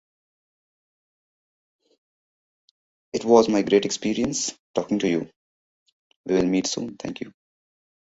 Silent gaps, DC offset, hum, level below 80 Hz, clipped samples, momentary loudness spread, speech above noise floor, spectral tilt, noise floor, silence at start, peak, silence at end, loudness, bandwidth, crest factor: 4.59-4.74 s, 5.36-5.86 s, 5.93-6.24 s; under 0.1%; none; -60 dBFS; under 0.1%; 17 LU; over 68 dB; -4.5 dB/octave; under -90 dBFS; 3.15 s; -2 dBFS; 0.85 s; -23 LUFS; 8 kHz; 24 dB